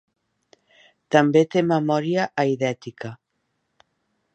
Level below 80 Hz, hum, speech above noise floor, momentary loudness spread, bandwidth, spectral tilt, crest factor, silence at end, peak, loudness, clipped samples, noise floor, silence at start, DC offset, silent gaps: -70 dBFS; none; 54 dB; 17 LU; 8.4 kHz; -6.5 dB/octave; 20 dB; 1.2 s; -2 dBFS; -21 LUFS; under 0.1%; -74 dBFS; 1.1 s; under 0.1%; none